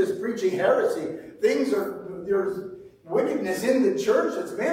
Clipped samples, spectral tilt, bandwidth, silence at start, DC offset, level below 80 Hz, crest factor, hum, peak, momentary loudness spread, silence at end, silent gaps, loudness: under 0.1%; -5 dB/octave; 16 kHz; 0 s; under 0.1%; -66 dBFS; 14 dB; none; -10 dBFS; 12 LU; 0 s; none; -25 LUFS